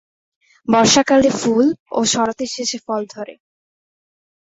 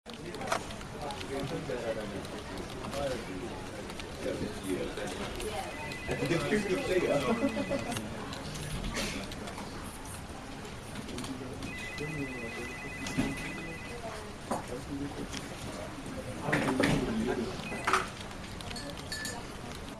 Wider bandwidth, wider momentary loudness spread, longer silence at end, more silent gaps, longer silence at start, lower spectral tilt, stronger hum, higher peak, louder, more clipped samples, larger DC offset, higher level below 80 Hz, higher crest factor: second, 8 kHz vs 14 kHz; first, 18 LU vs 12 LU; first, 1.05 s vs 0 s; first, 1.80-1.86 s vs none; first, 0.7 s vs 0.05 s; second, -3 dB/octave vs -4.5 dB/octave; neither; first, -2 dBFS vs -12 dBFS; first, -16 LUFS vs -35 LUFS; neither; neither; about the same, -54 dBFS vs -50 dBFS; second, 16 dB vs 24 dB